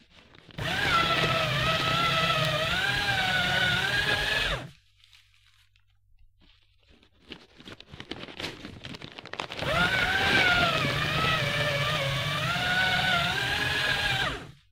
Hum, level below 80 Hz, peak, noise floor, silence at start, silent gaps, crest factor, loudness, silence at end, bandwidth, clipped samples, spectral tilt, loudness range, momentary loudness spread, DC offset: none; -48 dBFS; -10 dBFS; -63 dBFS; 0.5 s; none; 18 dB; -25 LUFS; 0.2 s; 16 kHz; under 0.1%; -3.5 dB/octave; 17 LU; 18 LU; under 0.1%